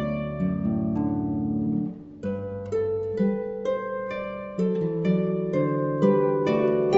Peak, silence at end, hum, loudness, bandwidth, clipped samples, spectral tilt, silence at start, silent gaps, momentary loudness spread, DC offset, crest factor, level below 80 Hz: -8 dBFS; 0 s; none; -26 LUFS; 7.6 kHz; under 0.1%; -9.5 dB/octave; 0 s; none; 9 LU; under 0.1%; 16 dB; -52 dBFS